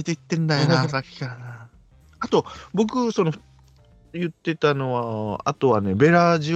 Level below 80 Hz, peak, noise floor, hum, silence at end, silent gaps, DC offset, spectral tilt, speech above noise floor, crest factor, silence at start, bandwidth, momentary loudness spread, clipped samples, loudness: -58 dBFS; -2 dBFS; -53 dBFS; none; 0 s; none; under 0.1%; -6.5 dB/octave; 31 dB; 20 dB; 0 s; 8.2 kHz; 16 LU; under 0.1%; -22 LUFS